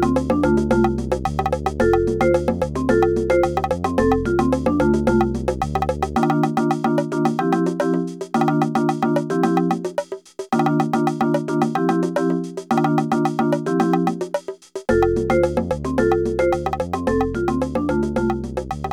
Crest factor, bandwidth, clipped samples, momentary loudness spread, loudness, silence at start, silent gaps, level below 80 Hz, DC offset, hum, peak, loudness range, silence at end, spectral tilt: 16 dB; 16 kHz; under 0.1%; 5 LU; -20 LUFS; 0 s; none; -36 dBFS; under 0.1%; none; -4 dBFS; 2 LU; 0 s; -7.5 dB/octave